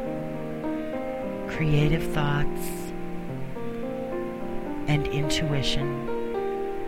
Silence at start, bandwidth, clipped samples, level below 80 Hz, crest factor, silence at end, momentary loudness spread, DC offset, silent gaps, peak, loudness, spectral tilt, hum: 0 s; 16 kHz; under 0.1%; -38 dBFS; 18 dB; 0 s; 10 LU; under 0.1%; none; -10 dBFS; -29 LUFS; -6 dB/octave; none